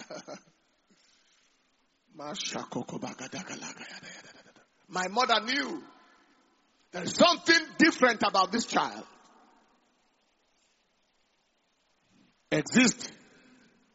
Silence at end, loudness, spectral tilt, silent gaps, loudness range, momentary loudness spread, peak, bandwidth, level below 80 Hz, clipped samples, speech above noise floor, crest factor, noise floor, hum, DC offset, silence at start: 0.8 s; -27 LUFS; -1.5 dB/octave; none; 14 LU; 21 LU; -6 dBFS; 8 kHz; -74 dBFS; under 0.1%; 45 dB; 24 dB; -73 dBFS; none; under 0.1%; 0 s